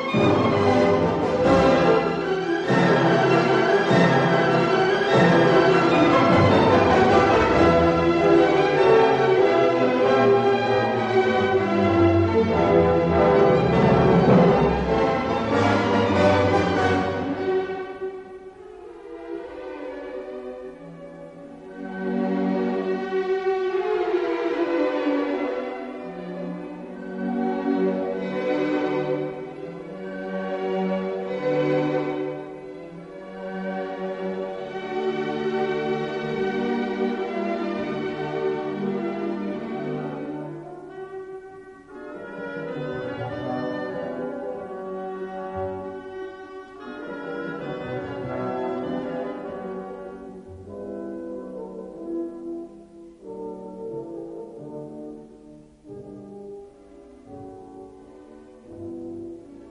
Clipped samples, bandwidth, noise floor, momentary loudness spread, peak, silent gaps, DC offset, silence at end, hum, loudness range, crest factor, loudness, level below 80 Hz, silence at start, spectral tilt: under 0.1%; 8.6 kHz; -47 dBFS; 21 LU; -6 dBFS; none; under 0.1%; 0 s; none; 18 LU; 18 dB; -22 LUFS; -48 dBFS; 0 s; -7 dB/octave